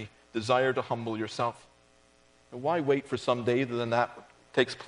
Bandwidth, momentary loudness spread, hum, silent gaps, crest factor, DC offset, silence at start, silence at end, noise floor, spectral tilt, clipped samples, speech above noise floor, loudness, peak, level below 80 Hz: 10.5 kHz; 8 LU; none; none; 22 dB; under 0.1%; 0 s; 0 s; -62 dBFS; -5.5 dB/octave; under 0.1%; 33 dB; -30 LUFS; -8 dBFS; -70 dBFS